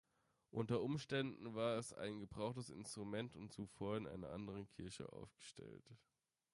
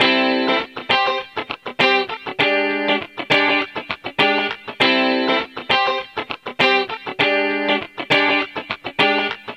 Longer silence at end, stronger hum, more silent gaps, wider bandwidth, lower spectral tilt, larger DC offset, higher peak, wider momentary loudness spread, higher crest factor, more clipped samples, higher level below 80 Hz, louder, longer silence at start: first, 0.55 s vs 0 s; neither; neither; second, 11.5 kHz vs 13 kHz; first, -5.5 dB/octave vs -4 dB/octave; neither; second, -28 dBFS vs -2 dBFS; first, 14 LU vs 10 LU; about the same, 18 dB vs 18 dB; neither; second, -72 dBFS vs -62 dBFS; second, -47 LUFS vs -18 LUFS; first, 0.55 s vs 0 s